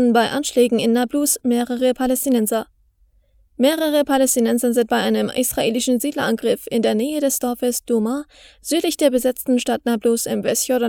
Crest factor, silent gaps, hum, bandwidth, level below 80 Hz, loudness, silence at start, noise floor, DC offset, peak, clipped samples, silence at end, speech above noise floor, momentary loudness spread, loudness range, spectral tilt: 16 dB; none; none; over 20 kHz; -54 dBFS; -19 LUFS; 0 s; -58 dBFS; under 0.1%; -2 dBFS; under 0.1%; 0 s; 39 dB; 4 LU; 2 LU; -3.5 dB/octave